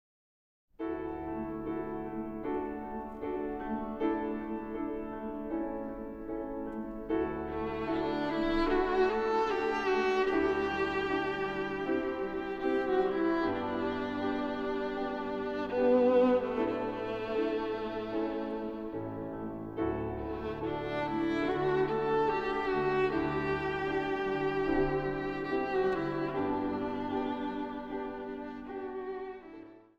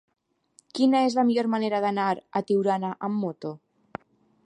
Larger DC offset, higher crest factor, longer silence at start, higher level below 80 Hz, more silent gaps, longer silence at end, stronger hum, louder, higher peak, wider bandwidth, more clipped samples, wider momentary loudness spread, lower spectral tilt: neither; about the same, 16 dB vs 16 dB; about the same, 0.8 s vs 0.75 s; first, -52 dBFS vs -74 dBFS; neither; second, 0.2 s vs 0.9 s; neither; second, -33 LUFS vs -25 LUFS; second, -16 dBFS vs -10 dBFS; second, 7.6 kHz vs 10 kHz; neither; second, 10 LU vs 22 LU; about the same, -7 dB/octave vs -6.5 dB/octave